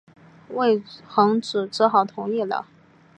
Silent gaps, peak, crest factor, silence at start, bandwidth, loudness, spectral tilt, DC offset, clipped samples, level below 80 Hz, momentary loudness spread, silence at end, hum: none; -4 dBFS; 18 dB; 0.5 s; 10 kHz; -22 LUFS; -5.5 dB/octave; under 0.1%; under 0.1%; -74 dBFS; 8 LU; 0.55 s; none